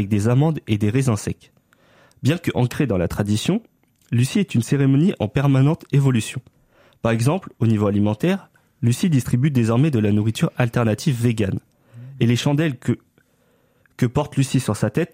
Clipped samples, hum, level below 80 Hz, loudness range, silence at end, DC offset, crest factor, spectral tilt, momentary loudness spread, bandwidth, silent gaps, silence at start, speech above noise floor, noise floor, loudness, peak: under 0.1%; none; -50 dBFS; 3 LU; 0.05 s; under 0.1%; 16 dB; -7 dB/octave; 7 LU; 16 kHz; none; 0 s; 42 dB; -61 dBFS; -20 LUFS; -4 dBFS